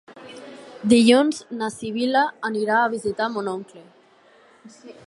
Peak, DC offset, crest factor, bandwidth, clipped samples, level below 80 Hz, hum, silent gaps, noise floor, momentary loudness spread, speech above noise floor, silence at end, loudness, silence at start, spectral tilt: -2 dBFS; under 0.1%; 20 dB; 11.5 kHz; under 0.1%; -64 dBFS; none; none; -54 dBFS; 24 LU; 33 dB; 0.15 s; -21 LUFS; 0.1 s; -4.5 dB/octave